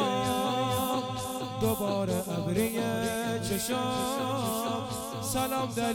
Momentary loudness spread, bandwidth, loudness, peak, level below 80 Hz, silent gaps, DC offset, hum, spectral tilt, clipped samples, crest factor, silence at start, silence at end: 5 LU; 19 kHz; -30 LUFS; -14 dBFS; -54 dBFS; none; under 0.1%; none; -4.5 dB/octave; under 0.1%; 16 dB; 0 s; 0 s